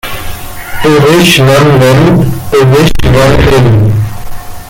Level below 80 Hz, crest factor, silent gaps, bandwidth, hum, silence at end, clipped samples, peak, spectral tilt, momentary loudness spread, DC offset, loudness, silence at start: -20 dBFS; 6 dB; none; 17 kHz; none; 0 s; 0.2%; 0 dBFS; -6 dB/octave; 16 LU; under 0.1%; -6 LUFS; 0.05 s